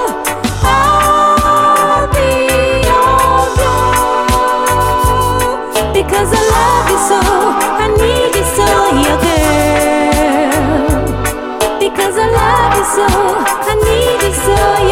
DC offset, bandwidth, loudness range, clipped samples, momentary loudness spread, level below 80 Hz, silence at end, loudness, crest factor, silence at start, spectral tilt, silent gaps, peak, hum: under 0.1%; 17 kHz; 2 LU; under 0.1%; 5 LU; -22 dBFS; 0 s; -11 LUFS; 10 dB; 0 s; -4 dB/octave; none; 0 dBFS; none